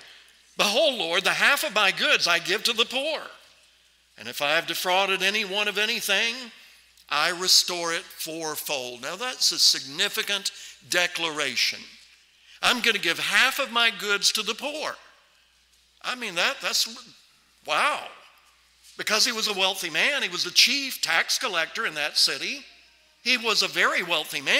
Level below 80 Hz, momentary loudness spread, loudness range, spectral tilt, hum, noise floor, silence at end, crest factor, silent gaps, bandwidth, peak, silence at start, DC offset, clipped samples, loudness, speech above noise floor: -72 dBFS; 13 LU; 4 LU; 0 dB/octave; none; -62 dBFS; 0 s; 20 dB; none; 16 kHz; -6 dBFS; 0 s; under 0.1%; under 0.1%; -23 LUFS; 37 dB